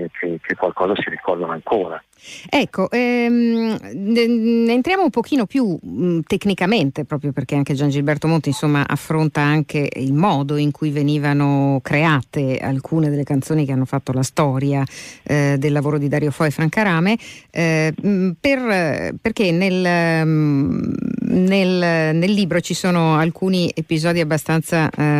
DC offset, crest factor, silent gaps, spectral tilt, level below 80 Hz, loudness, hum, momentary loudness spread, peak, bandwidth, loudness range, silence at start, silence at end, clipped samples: under 0.1%; 12 dB; none; -6.5 dB/octave; -52 dBFS; -18 LUFS; none; 6 LU; -6 dBFS; 15 kHz; 2 LU; 0 s; 0 s; under 0.1%